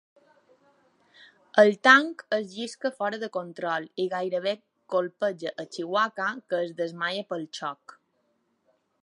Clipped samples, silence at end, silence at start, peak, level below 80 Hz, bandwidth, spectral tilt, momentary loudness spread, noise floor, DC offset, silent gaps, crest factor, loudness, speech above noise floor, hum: under 0.1%; 1.3 s; 1.55 s; -2 dBFS; -86 dBFS; 11 kHz; -4 dB/octave; 16 LU; -72 dBFS; under 0.1%; none; 26 dB; -26 LUFS; 46 dB; none